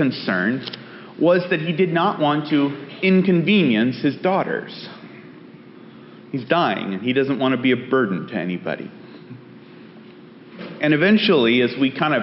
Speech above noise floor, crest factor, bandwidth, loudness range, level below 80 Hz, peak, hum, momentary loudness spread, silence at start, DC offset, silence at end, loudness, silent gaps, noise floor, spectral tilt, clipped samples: 24 dB; 16 dB; 5.8 kHz; 6 LU; -68 dBFS; -4 dBFS; none; 20 LU; 0 s; under 0.1%; 0 s; -19 LUFS; none; -43 dBFS; -4.5 dB/octave; under 0.1%